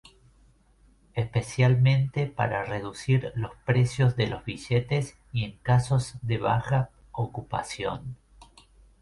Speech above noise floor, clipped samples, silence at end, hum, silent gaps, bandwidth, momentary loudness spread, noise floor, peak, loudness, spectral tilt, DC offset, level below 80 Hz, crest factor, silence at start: 34 dB; under 0.1%; 0.85 s; none; none; 11.5 kHz; 11 LU; -60 dBFS; -10 dBFS; -27 LUFS; -6.5 dB/octave; under 0.1%; -50 dBFS; 16 dB; 1.15 s